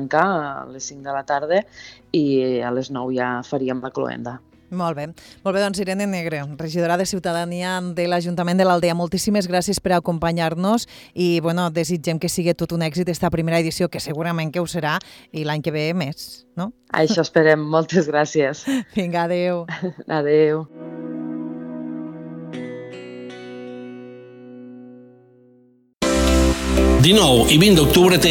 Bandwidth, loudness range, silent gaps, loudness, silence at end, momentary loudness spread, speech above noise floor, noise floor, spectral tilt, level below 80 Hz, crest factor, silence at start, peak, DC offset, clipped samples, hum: 19 kHz; 12 LU; none; -20 LUFS; 0 s; 18 LU; 35 dB; -55 dBFS; -5 dB/octave; -34 dBFS; 18 dB; 0 s; -4 dBFS; under 0.1%; under 0.1%; none